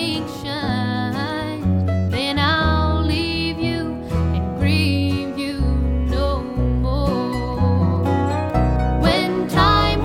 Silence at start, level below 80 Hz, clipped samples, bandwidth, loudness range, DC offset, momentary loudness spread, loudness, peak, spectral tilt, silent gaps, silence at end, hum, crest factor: 0 s; -26 dBFS; under 0.1%; 15.5 kHz; 2 LU; 0.1%; 6 LU; -20 LUFS; 0 dBFS; -6.5 dB/octave; none; 0 s; none; 18 dB